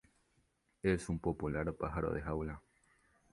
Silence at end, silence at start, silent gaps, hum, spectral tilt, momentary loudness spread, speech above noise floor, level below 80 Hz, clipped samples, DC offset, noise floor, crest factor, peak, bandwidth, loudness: 0.75 s; 0.85 s; none; none; -7.5 dB/octave; 6 LU; 40 dB; -52 dBFS; under 0.1%; under 0.1%; -77 dBFS; 22 dB; -18 dBFS; 11.5 kHz; -38 LUFS